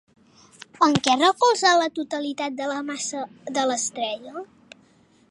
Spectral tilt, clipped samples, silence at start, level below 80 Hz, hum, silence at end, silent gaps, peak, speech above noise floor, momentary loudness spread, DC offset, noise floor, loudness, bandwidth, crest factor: -3 dB/octave; under 0.1%; 0.6 s; -66 dBFS; none; 0.85 s; none; -4 dBFS; 35 dB; 15 LU; under 0.1%; -58 dBFS; -22 LUFS; 11.5 kHz; 20 dB